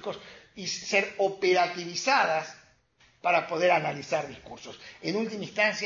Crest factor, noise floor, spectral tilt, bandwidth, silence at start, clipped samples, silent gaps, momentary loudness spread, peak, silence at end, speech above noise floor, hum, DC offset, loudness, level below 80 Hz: 20 dB; -64 dBFS; -3.5 dB/octave; 7.6 kHz; 0 s; under 0.1%; none; 18 LU; -8 dBFS; 0 s; 35 dB; none; under 0.1%; -27 LUFS; -70 dBFS